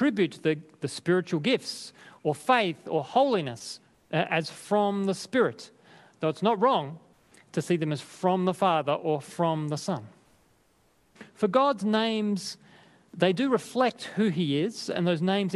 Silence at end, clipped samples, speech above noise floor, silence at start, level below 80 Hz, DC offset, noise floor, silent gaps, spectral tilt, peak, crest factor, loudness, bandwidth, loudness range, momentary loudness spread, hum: 0 s; under 0.1%; 39 dB; 0 s; -74 dBFS; under 0.1%; -66 dBFS; none; -5.5 dB/octave; -8 dBFS; 20 dB; -27 LUFS; 12.5 kHz; 2 LU; 12 LU; none